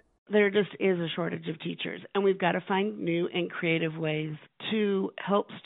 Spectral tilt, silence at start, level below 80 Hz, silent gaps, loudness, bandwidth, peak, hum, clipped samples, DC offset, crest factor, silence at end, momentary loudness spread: -4.5 dB/octave; 0.3 s; -76 dBFS; none; -29 LUFS; 4 kHz; -10 dBFS; none; under 0.1%; under 0.1%; 20 dB; 0.05 s; 9 LU